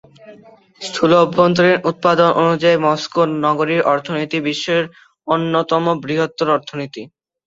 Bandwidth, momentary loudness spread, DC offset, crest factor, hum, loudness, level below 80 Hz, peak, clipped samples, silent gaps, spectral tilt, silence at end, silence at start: 8 kHz; 14 LU; under 0.1%; 16 dB; none; -16 LUFS; -58 dBFS; -2 dBFS; under 0.1%; none; -5.5 dB/octave; 0.4 s; 0.25 s